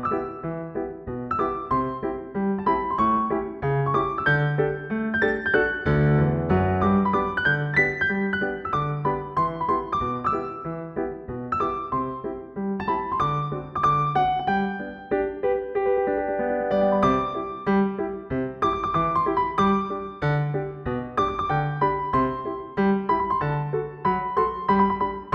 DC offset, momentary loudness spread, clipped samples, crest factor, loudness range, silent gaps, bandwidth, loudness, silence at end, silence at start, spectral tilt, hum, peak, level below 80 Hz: under 0.1%; 9 LU; under 0.1%; 16 dB; 5 LU; none; 6.6 kHz; -24 LUFS; 0 s; 0 s; -8.5 dB/octave; none; -8 dBFS; -46 dBFS